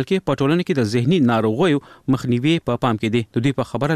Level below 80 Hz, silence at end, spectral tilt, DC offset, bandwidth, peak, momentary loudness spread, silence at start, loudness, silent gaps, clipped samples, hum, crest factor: -52 dBFS; 0 s; -7 dB/octave; 0.2%; 14 kHz; -4 dBFS; 5 LU; 0 s; -19 LUFS; none; under 0.1%; none; 14 dB